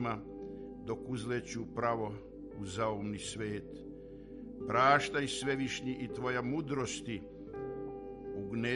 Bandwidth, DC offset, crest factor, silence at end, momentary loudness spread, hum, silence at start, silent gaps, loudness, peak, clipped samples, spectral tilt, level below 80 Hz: 11.5 kHz; under 0.1%; 24 dB; 0 s; 17 LU; none; 0 s; none; -36 LUFS; -14 dBFS; under 0.1%; -5 dB/octave; -60 dBFS